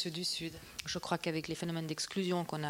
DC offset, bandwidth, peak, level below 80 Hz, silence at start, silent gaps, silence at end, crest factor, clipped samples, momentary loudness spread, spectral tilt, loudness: under 0.1%; 16.5 kHz; -18 dBFS; -66 dBFS; 0 s; none; 0 s; 20 dB; under 0.1%; 5 LU; -4 dB/octave; -37 LUFS